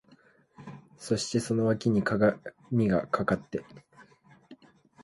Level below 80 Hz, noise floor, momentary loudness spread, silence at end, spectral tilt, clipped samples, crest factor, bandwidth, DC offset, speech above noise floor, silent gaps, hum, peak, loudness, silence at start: -60 dBFS; -61 dBFS; 21 LU; 0.5 s; -6 dB/octave; under 0.1%; 18 dB; 11.5 kHz; under 0.1%; 33 dB; none; none; -12 dBFS; -28 LUFS; 0.6 s